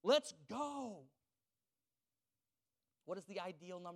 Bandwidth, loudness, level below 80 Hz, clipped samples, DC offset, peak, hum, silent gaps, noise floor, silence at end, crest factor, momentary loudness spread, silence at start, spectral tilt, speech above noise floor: 14 kHz; -44 LUFS; under -90 dBFS; under 0.1%; under 0.1%; -22 dBFS; none; none; under -90 dBFS; 0 s; 24 dB; 17 LU; 0.05 s; -3.5 dB/octave; over 44 dB